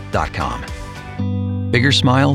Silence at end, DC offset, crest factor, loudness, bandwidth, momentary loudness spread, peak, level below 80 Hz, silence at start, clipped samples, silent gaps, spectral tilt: 0 s; under 0.1%; 18 dB; -18 LUFS; 12 kHz; 17 LU; 0 dBFS; -34 dBFS; 0 s; under 0.1%; none; -5.5 dB/octave